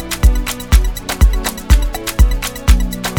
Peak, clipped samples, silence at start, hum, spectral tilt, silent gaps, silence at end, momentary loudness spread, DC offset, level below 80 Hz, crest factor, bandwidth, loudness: 0 dBFS; 0.4%; 0 s; none; -4.5 dB/octave; none; 0 s; 5 LU; under 0.1%; -14 dBFS; 12 dB; over 20 kHz; -16 LUFS